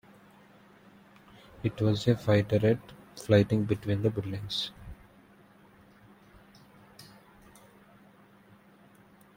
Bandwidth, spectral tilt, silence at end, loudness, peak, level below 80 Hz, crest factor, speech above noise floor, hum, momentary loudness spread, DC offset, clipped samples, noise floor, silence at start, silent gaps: 16 kHz; -7 dB/octave; 2.35 s; -28 LUFS; -8 dBFS; -60 dBFS; 24 dB; 31 dB; none; 25 LU; under 0.1%; under 0.1%; -58 dBFS; 1.6 s; none